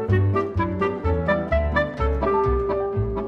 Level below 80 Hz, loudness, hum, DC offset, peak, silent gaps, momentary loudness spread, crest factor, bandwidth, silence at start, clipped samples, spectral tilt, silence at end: -30 dBFS; -23 LUFS; none; under 0.1%; -8 dBFS; none; 3 LU; 14 dB; 6.2 kHz; 0 s; under 0.1%; -9 dB/octave; 0 s